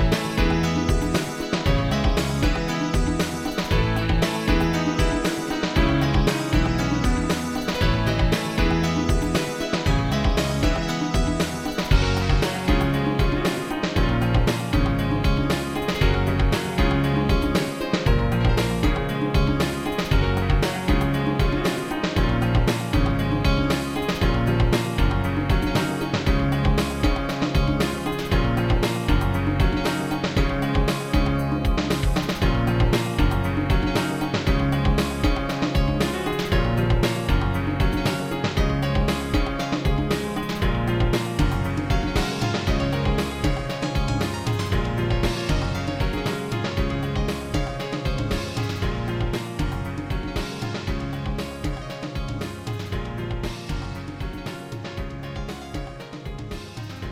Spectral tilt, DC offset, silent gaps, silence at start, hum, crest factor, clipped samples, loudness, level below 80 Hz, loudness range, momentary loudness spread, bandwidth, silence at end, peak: -6 dB/octave; under 0.1%; none; 0 s; none; 16 dB; under 0.1%; -23 LUFS; -28 dBFS; 6 LU; 8 LU; 16 kHz; 0 s; -6 dBFS